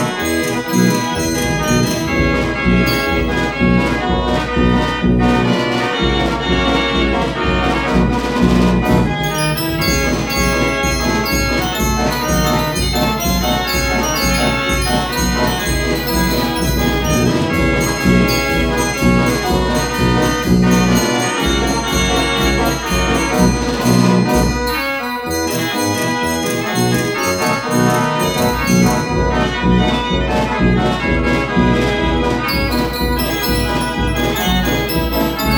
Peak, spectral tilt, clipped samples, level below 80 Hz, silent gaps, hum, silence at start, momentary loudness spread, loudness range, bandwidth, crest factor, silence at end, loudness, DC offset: 0 dBFS; -4.5 dB/octave; under 0.1%; -24 dBFS; none; none; 0 s; 3 LU; 1 LU; over 20 kHz; 14 dB; 0 s; -15 LUFS; under 0.1%